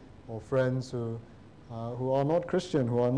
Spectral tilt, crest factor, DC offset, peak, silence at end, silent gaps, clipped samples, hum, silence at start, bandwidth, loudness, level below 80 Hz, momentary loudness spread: -7.5 dB/octave; 12 dB; 0.1%; -18 dBFS; 0 s; none; under 0.1%; none; 0 s; 10 kHz; -30 LUFS; -60 dBFS; 15 LU